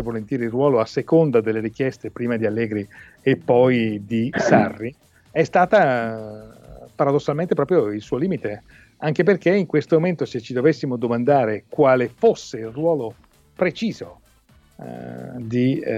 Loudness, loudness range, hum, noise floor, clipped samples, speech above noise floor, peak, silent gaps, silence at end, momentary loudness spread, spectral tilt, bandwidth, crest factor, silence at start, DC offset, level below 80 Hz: -20 LUFS; 4 LU; none; -55 dBFS; under 0.1%; 35 dB; -2 dBFS; none; 0 s; 16 LU; -7.5 dB/octave; 9 kHz; 18 dB; 0 s; under 0.1%; -56 dBFS